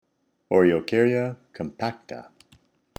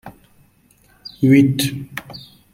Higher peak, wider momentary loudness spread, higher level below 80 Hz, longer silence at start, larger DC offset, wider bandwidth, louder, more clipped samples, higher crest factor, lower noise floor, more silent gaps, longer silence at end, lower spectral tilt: second, -6 dBFS vs -2 dBFS; second, 20 LU vs 25 LU; second, -62 dBFS vs -54 dBFS; first, 0.5 s vs 0.05 s; neither; second, 9 kHz vs 16.5 kHz; second, -23 LUFS vs -16 LUFS; neither; about the same, 20 dB vs 18 dB; first, -60 dBFS vs -55 dBFS; neither; first, 0.75 s vs 0.35 s; first, -7.5 dB/octave vs -6 dB/octave